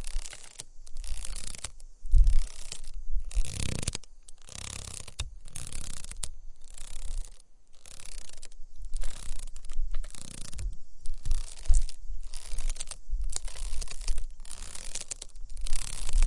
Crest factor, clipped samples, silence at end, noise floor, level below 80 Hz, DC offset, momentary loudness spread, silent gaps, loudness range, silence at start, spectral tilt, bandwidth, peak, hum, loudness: 20 dB; under 0.1%; 0 s; -46 dBFS; -30 dBFS; under 0.1%; 15 LU; none; 10 LU; 0 s; -3 dB/octave; 11.5 kHz; -6 dBFS; none; -38 LUFS